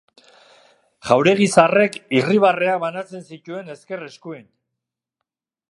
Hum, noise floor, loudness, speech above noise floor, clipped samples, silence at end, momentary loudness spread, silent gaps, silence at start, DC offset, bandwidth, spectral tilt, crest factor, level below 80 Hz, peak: none; -83 dBFS; -17 LUFS; 65 dB; under 0.1%; 1.3 s; 21 LU; none; 1.05 s; under 0.1%; 11.5 kHz; -5 dB/octave; 20 dB; -66 dBFS; 0 dBFS